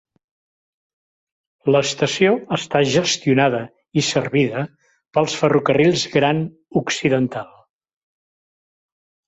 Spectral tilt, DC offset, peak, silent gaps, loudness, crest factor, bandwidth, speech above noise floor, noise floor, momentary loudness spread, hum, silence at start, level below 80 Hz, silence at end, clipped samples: -4.5 dB/octave; under 0.1%; -2 dBFS; none; -19 LUFS; 18 dB; 8.2 kHz; over 72 dB; under -90 dBFS; 8 LU; none; 1.65 s; -58 dBFS; 1.8 s; under 0.1%